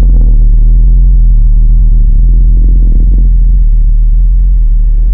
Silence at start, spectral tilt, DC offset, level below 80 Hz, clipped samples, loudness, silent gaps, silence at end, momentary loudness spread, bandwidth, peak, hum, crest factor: 0 s; -12.5 dB/octave; under 0.1%; -4 dBFS; under 0.1%; -10 LUFS; none; 0 s; 2 LU; 0.6 kHz; 0 dBFS; none; 4 dB